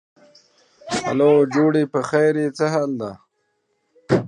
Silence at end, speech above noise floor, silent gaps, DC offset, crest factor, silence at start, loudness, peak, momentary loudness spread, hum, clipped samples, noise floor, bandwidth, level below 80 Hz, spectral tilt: 0 s; 52 dB; none; under 0.1%; 18 dB; 0.85 s; -19 LUFS; -2 dBFS; 11 LU; none; under 0.1%; -70 dBFS; 10.5 kHz; -58 dBFS; -6.5 dB/octave